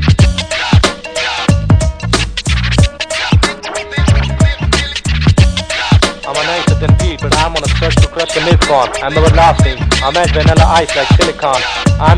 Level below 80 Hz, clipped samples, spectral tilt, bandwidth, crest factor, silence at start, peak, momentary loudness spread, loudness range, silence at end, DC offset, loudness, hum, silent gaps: -18 dBFS; 0.6%; -5 dB/octave; 10.5 kHz; 10 dB; 0 s; 0 dBFS; 6 LU; 3 LU; 0 s; under 0.1%; -11 LUFS; none; none